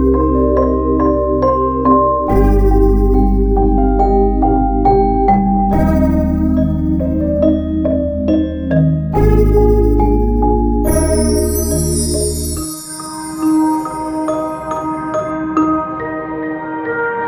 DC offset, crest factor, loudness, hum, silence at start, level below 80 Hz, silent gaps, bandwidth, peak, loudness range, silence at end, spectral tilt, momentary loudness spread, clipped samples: under 0.1%; 12 dB; -14 LUFS; none; 0 s; -18 dBFS; none; over 20 kHz; 0 dBFS; 5 LU; 0 s; -7 dB/octave; 8 LU; under 0.1%